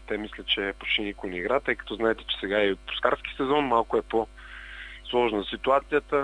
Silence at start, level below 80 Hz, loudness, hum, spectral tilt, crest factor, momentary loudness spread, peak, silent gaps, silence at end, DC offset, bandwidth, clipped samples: 0 s; -48 dBFS; -27 LUFS; none; -5.5 dB/octave; 20 dB; 10 LU; -6 dBFS; none; 0 s; under 0.1%; 10.5 kHz; under 0.1%